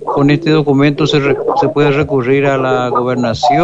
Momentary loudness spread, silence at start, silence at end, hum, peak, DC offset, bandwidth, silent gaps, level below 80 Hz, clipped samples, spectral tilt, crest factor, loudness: 3 LU; 0 s; 0 s; none; -2 dBFS; under 0.1%; 8 kHz; none; -42 dBFS; under 0.1%; -7 dB/octave; 10 dB; -12 LUFS